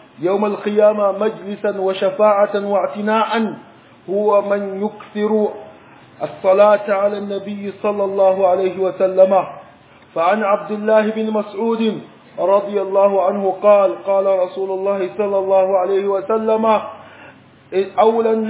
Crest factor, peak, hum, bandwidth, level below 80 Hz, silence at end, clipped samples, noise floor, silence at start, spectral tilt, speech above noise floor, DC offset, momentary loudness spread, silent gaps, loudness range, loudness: 16 dB; 0 dBFS; none; 4 kHz; -68 dBFS; 0 s; under 0.1%; -45 dBFS; 0.2 s; -10 dB/octave; 29 dB; under 0.1%; 10 LU; none; 3 LU; -17 LUFS